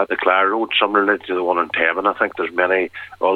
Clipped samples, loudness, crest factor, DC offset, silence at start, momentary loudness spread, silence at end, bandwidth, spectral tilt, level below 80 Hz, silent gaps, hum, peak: under 0.1%; -18 LUFS; 16 dB; under 0.1%; 0 s; 5 LU; 0 s; 4.9 kHz; -5.5 dB/octave; -64 dBFS; none; none; -2 dBFS